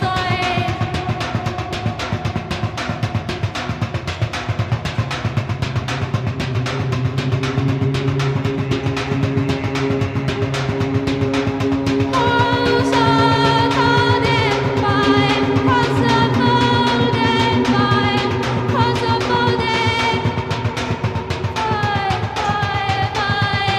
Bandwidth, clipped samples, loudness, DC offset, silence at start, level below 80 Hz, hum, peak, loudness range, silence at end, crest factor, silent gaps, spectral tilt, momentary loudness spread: 12.5 kHz; under 0.1%; -18 LUFS; under 0.1%; 0 s; -38 dBFS; none; 0 dBFS; 7 LU; 0 s; 16 dB; none; -6 dB/octave; 8 LU